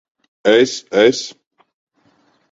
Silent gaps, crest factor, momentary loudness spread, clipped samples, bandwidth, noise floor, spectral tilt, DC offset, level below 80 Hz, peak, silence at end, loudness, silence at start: none; 18 dB; 11 LU; under 0.1%; 8 kHz; -58 dBFS; -3.5 dB/octave; under 0.1%; -60 dBFS; 0 dBFS; 1.2 s; -15 LUFS; 0.45 s